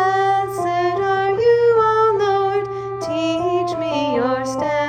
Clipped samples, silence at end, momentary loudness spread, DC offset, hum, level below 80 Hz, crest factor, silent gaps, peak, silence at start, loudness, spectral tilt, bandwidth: under 0.1%; 0 s; 7 LU; under 0.1%; none; -54 dBFS; 12 dB; none; -6 dBFS; 0 s; -18 LUFS; -5.5 dB/octave; 15 kHz